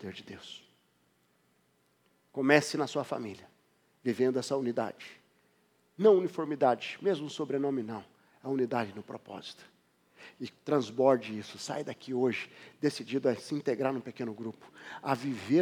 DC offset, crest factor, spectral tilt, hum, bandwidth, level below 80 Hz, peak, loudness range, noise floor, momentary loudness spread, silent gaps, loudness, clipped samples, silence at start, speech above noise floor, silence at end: under 0.1%; 26 dB; -5.5 dB/octave; none; 15.5 kHz; -86 dBFS; -8 dBFS; 5 LU; -71 dBFS; 19 LU; none; -31 LUFS; under 0.1%; 0 s; 40 dB; 0 s